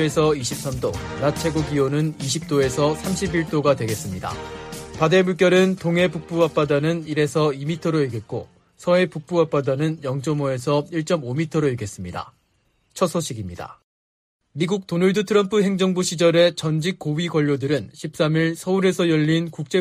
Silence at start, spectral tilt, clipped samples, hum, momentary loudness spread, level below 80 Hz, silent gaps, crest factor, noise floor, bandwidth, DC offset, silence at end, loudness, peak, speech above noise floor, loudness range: 0 s; -5.5 dB/octave; under 0.1%; none; 12 LU; -48 dBFS; 13.84-14.39 s; 18 dB; -65 dBFS; 15.5 kHz; under 0.1%; 0 s; -21 LUFS; -4 dBFS; 45 dB; 5 LU